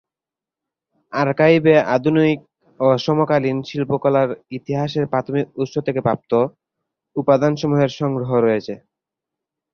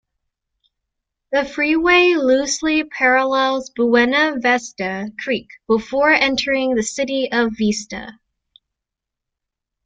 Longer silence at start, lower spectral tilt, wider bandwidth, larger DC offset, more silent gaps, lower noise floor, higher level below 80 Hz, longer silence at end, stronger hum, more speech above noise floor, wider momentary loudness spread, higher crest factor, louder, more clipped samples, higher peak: second, 1.1 s vs 1.3 s; first, -7.5 dB/octave vs -3 dB/octave; second, 6.8 kHz vs 9.4 kHz; neither; neither; first, -88 dBFS vs -83 dBFS; second, -58 dBFS vs -52 dBFS; second, 1 s vs 1.75 s; neither; first, 71 dB vs 66 dB; about the same, 10 LU vs 11 LU; about the same, 18 dB vs 16 dB; about the same, -18 LUFS vs -17 LUFS; neither; about the same, -2 dBFS vs -2 dBFS